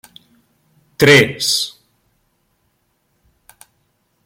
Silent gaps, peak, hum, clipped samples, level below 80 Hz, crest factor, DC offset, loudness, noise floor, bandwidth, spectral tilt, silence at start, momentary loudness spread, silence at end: none; 0 dBFS; none; under 0.1%; -54 dBFS; 20 dB; under 0.1%; -13 LUFS; -65 dBFS; 16.5 kHz; -3.5 dB/octave; 1 s; 10 LU; 2.55 s